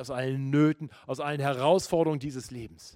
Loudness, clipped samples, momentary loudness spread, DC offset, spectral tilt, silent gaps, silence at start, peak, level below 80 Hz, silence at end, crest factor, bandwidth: -28 LUFS; under 0.1%; 14 LU; under 0.1%; -6.5 dB/octave; none; 0 s; -10 dBFS; -60 dBFS; 0.05 s; 18 dB; 16 kHz